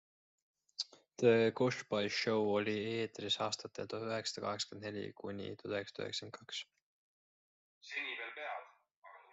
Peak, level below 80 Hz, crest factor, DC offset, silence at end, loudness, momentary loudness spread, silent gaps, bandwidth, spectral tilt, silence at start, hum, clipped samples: -16 dBFS; -82 dBFS; 24 dB; under 0.1%; 0.1 s; -38 LUFS; 13 LU; 6.82-7.81 s, 8.96-9.02 s; 8.2 kHz; -4 dB/octave; 0.8 s; none; under 0.1%